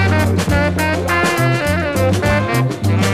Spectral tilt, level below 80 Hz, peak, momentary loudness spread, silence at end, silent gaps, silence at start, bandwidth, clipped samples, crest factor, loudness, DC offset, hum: -5.5 dB/octave; -32 dBFS; -2 dBFS; 2 LU; 0 s; none; 0 s; 15.5 kHz; under 0.1%; 12 dB; -16 LUFS; under 0.1%; none